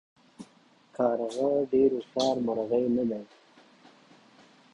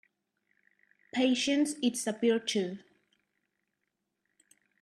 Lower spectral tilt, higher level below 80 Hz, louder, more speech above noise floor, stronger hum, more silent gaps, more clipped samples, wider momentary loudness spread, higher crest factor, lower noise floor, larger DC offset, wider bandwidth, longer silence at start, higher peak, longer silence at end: first, -6 dB/octave vs -3.5 dB/octave; first, -68 dBFS vs -82 dBFS; about the same, -28 LUFS vs -30 LUFS; second, 34 dB vs 54 dB; neither; neither; neither; second, 7 LU vs 10 LU; about the same, 18 dB vs 18 dB; second, -60 dBFS vs -83 dBFS; neither; second, 11 kHz vs 13.5 kHz; second, 0.4 s vs 1.15 s; first, -12 dBFS vs -16 dBFS; second, 1.5 s vs 2.05 s